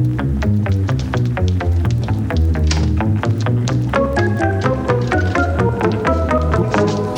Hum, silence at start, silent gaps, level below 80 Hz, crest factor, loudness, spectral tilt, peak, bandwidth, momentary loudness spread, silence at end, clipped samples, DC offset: none; 0 s; none; -24 dBFS; 16 dB; -17 LUFS; -7 dB/octave; 0 dBFS; 9.4 kHz; 2 LU; 0 s; under 0.1%; under 0.1%